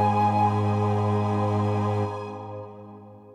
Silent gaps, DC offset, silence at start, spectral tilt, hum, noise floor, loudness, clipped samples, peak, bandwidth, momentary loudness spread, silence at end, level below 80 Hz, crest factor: none; under 0.1%; 0 s; -8.5 dB/octave; none; -45 dBFS; -24 LUFS; under 0.1%; -12 dBFS; 8.8 kHz; 18 LU; 0 s; -62 dBFS; 14 dB